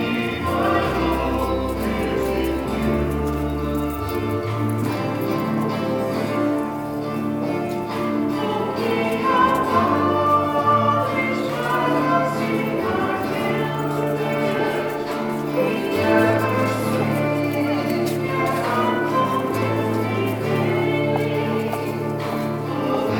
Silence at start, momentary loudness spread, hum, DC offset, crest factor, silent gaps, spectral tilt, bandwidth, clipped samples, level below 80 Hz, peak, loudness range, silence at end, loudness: 0 s; 6 LU; none; under 0.1%; 18 dB; none; -6.5 dB/octave; 19.5 kHz; under 0.1%; -40 dBFS; -4 dBFS; 4 LU; 0 s; -21 LUFS